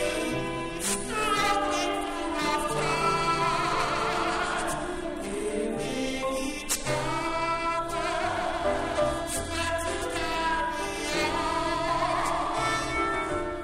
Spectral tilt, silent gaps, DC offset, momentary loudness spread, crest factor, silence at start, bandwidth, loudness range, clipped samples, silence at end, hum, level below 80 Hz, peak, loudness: -3.5 dB/octave; none; under 0.1%; 5 LU; 16 dB; 0 s; 16 kHz; 3 LU; under 0.1%; 0 s; none; -44 dBFS; -12 dBFS; -28 LUFS